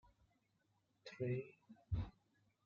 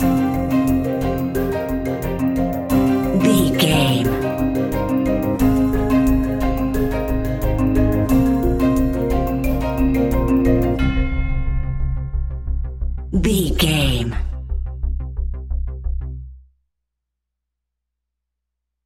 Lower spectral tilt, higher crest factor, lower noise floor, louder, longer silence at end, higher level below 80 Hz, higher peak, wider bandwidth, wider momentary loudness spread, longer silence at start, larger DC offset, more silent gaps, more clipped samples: about the same, -7.5 dB/octave vs -6.5 dB/octave; about the same, 18 dB vs 16 dB; about the same, -82 dBFS vs -80 dBFS; second, -46 LUFS vs -19 LUFS; second, 0.55 s vs 2.45 s; second, -60 dBFS vs -24 dBFS; second, -32 dBFS vs -2 dBFS; second, 7.2 kHz vs 17 kHz; first, 16 LU vs 11 LU; first, 1.05 s vs 0 s; neither; neither; neither